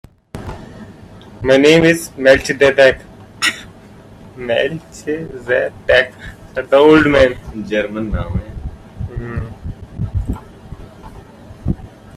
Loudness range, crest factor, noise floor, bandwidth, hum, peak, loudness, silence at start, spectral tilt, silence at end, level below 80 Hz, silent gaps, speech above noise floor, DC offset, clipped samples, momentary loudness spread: 13 LU; 16 dB; -39 dBFS; 14.5 kHz; none; 0 dBFS; -14 LUFS; 0.35 s; -5 dB/octave; 0.3 s; -34 dBFS; none; 26 dB; under 0.1%; under 0.1%; 22 LU